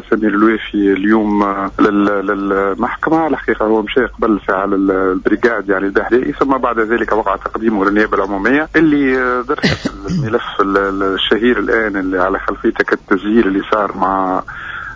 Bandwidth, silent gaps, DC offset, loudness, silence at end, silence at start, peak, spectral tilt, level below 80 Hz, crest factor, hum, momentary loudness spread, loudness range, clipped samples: 7.6 kHz; none; under 0.1%; -14 LUFS; 0 s; 0 s; -2 dBFS; -6.5 dB/octave; -38 dBFS; 14 dB; none; 5 LU; 1 LU; under 0.1%